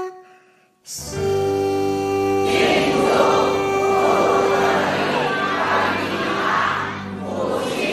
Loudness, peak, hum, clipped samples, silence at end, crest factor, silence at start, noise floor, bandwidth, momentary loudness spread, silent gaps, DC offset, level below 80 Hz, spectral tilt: -19 LUFS; -4 dBFS; none; under 0.1%; 0 s; 16 dB; 0 s; -55 dBFS; 15 kHz; 9 LU; none; under 0.1%; -50 dBFS; -4.5 dB/octave